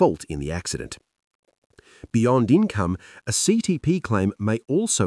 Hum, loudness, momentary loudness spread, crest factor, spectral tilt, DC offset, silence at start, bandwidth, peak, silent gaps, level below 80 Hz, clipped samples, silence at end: none; -23 LUFS; 11 LU; 18 dB; -5 dB/octave; under 0.1%; 0 s; 12 kHz; -6 dBFS; 1.27-1.43 s, 1.58-1.70 s; -50 dBFS; under 0.1%; 0 s